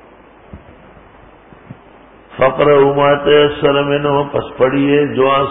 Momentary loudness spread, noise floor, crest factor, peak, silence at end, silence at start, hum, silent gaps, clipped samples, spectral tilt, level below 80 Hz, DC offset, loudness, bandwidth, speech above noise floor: 6 LU; -42 dBFS; 14 dB; 0 dBFS; 0 s; 0.55 s; none; none; under 0.1%; -11.5 dB/octave; -44 dBFS; under 0.1%; -13 LUFS; 3.9 kHz; 30 dB